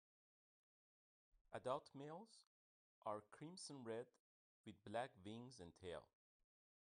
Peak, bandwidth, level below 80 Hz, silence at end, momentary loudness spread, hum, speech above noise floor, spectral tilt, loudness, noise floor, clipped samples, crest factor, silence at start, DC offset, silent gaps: -32 dBFS; 10 kHz; -86 dBFS; 0.85 s; 13 LU; none; over 37 dB; -5 dB/octave; -54 LUFS; under -90 dBFS; under 0.1%; 24 dB; 1.35 s; under 0.1%; 1.41-1.45 s, 2.47-3.02 s, 4.20-4.64 s